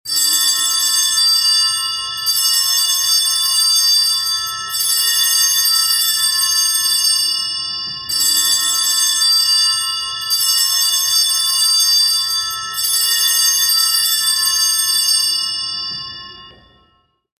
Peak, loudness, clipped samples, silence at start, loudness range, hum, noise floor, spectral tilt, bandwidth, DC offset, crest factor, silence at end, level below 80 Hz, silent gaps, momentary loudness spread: -2 dBFS; -12 LUFS; under 0.1%; 0.05 s; 1 LU; none; -59 dBFS; 4 dB/octave; 16 kHz; under 0.1%; 14 dB; 0.9 s; -56 dBFS; none; 8 LU